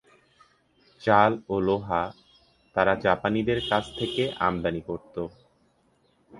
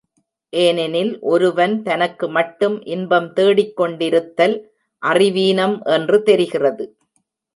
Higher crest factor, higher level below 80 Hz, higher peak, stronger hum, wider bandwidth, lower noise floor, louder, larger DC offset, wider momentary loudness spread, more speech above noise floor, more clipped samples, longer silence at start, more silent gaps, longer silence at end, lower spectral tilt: first, 24 dB vs 16 dB; first, -52 dBFS vs -70 dBFS; about the same, -4 dBFS vs -2 dBFS; neither; about the same, 11.5 kHz vs 11.5 kHz; about the same, -66 dBFS vs -68 dBFS; second, -26 LUFS vs -17 LUFS; neither; first, 14 LU vs 6 LU; second, 41 dB vs 52 dB; neither; first, 1 s vs 0.55 s; neither; second, 0 s vs 0.7 s; about the same, -6.5 dB/octave vs -5.5 dB/octave